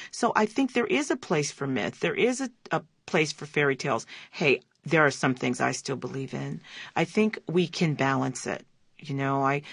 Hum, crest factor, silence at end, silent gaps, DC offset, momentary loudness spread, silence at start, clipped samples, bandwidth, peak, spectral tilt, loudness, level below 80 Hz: none; 22 dB; 0 s; none; under 0.1%; 9 LU; 0 s; under 0.1%; 11 kHz; -6 dBFS; -5 dB/octave; -27 LUFS; -70 dBFS